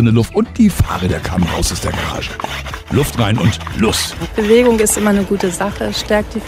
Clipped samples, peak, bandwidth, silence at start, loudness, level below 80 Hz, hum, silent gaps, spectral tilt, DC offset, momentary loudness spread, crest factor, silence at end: under 0.1%; 0 dBFS; 16 kHz; 0 s; -15 LUFS; -30 dBFS; none; none; -5 dB/octave; under 0.1%; 8 LU; 14 dB; 0 s